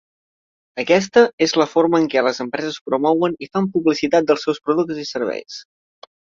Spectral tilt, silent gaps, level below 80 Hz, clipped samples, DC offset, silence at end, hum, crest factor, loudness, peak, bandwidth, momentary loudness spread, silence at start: -5 dB/octave; 1.33-1.38 s, 2.81-2.86 s; -62 dBFS; under 0.1%; under 0.1%; 0.6 s; none; 18 dB; -18 LUFS; -2 dBFS; 7.6 kHz; 10 LU; 0.75 s